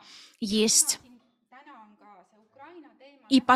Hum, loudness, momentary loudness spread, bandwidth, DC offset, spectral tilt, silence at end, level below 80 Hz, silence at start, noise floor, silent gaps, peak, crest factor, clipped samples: none; -24 LUFS; 13 LU; 15.5 kHz; under 0.1%; -1.5 dB/octave; 0 s; -68 dBFS; 0.4 s; -58 dBFS; none; -6 dBFS; 22 dB; under 0.1%